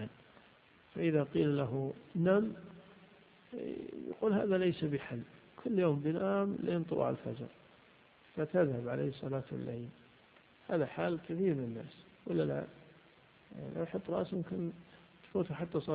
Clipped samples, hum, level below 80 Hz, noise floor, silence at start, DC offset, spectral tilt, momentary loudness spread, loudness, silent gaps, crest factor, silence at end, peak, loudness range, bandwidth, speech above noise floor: under 0.1%; none; -70 dBFS; -64 dBFS; 0 s; under 0.1%; -7 dB/octave; 17 LU; -36 LUFS; none; 20 dB; 0 s; -18 dBFS; 5 LU; 4.9 kHz; 29 dB